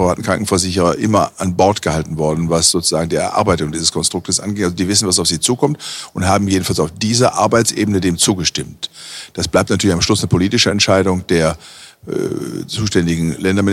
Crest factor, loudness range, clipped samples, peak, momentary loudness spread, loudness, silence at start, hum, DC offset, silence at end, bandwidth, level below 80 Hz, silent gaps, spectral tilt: 16 dB; 1 LU; under 0.1%; 0 dBFS; 10 LU; -15 LUFS; 0 s; none; under 0.1%; 0 s; 16 kHz; -40 dBFS; none; -4 dB/octave